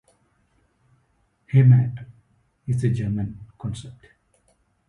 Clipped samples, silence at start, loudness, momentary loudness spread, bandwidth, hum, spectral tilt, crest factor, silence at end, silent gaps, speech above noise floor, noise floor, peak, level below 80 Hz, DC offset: under 0.1%; 1.55 s; -22 LUFS; 23 LU; 10 kHz; none; -9 dB/octave; 18 dB; 0.95 s; none; 46 dB; -66 dBFS; -6 dBFS; -52 dBFS; under 0.1%